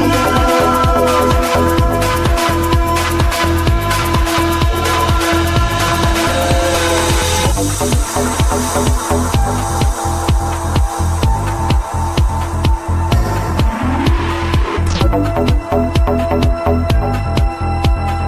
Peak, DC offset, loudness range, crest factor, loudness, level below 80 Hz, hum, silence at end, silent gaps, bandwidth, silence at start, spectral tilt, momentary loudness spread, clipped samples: -2 dBFS; under 0.1%; 3 LU; 12 dB; -15 LUFS; -18 dBFS; none; 0 s; none; 16 kHz; 0 s; -5 dB/octave; 4 LU; under 0.1%